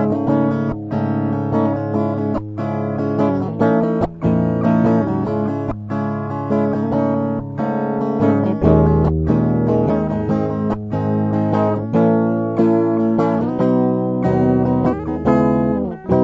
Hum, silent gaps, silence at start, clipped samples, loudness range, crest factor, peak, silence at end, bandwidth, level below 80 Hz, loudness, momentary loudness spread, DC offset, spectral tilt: none; none; 0 s; under 0.1%; 3 LU; 16 dB; -2 dBFS; 0 s; 7 kHz; -36 dBFS; -18 LUFS; 7 LU; under 0.1%; -10.5 dB/octave